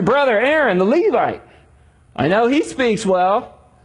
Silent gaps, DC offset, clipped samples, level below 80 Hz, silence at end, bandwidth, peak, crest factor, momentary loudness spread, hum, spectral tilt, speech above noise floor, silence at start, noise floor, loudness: none; under 0.1%; under 0.1%; -50 dBFS; 0.35 s; 11 kHz; -4 dBFS; 14 dB; 7 LU; none; -5.5 dB/octave; 34 dB; 0 s; -50 dBFS; -16 LUFS